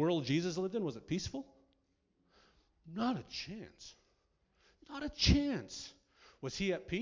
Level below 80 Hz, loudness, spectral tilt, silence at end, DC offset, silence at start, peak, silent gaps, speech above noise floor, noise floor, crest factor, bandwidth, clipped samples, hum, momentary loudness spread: -48 dBFS; -37 LUFS; -5 dB/octave; 0 s; under 0.1%; 0 s; -16 dBFS; none; 41 dB; -78 dBFS; 22 dB; 7.6 kHz; under 0.1%; none; 19 LU